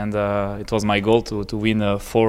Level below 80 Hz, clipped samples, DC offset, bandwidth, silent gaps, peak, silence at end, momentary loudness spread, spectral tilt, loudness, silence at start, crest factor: -40 dBFS; under 0.1%; under 0.1%; 15.5 kHz; none; -2 dBFS; 0 s; 6 LU; -6 dB/octave; -21 LUFS; 0 s; 18 dB